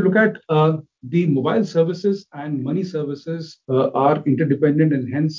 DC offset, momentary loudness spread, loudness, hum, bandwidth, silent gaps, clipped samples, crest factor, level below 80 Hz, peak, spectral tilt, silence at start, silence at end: under 0.1%; 10 LU; -20 LUFS; none; 7.4 kHz; none; under 0.1%; 16 dB; -66 dBFS; -4 dBFS; -8.5 dB/octave; 0 s; 0 s